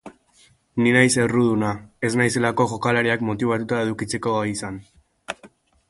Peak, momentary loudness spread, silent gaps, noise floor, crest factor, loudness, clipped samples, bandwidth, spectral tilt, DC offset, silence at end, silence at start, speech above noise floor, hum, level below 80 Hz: -2 dBFS; 18 LU; none; -57 dBFS; 20 dB; -21 LUFS; under 0.1%; 11.5 kHz; -5 dB/octave; under 0.1%; 0.4 s; 0.05 s; 37 dB; none; -54 dBFS